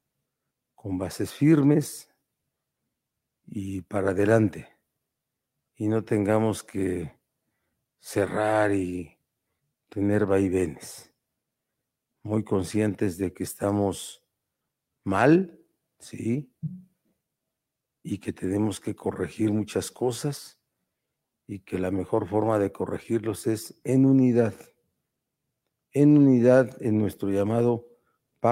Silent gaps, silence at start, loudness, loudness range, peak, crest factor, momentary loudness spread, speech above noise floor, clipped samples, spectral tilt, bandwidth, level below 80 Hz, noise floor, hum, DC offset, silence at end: none; 0.85 s; -25 LUFS; 8 LU; -6 dBFS; 20 dB; 18 LU; 60 dB; under 0.1%; -7 dB/octave; 16 kHz; -66 dBFS; -85 dBFS; none; under 0.1%; 0 s